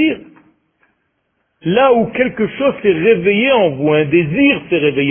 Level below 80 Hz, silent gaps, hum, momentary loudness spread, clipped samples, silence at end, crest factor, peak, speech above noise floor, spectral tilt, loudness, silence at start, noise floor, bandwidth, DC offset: -50 dBFS; none; none; 5 LU; under 0.1%; 0 s; 14 dB; 0 dBFS; 53 dB; -11.5 dB/octave; -13 LUFS; 0 s; -66 dBFS; 3.5 kHz; under 0.1%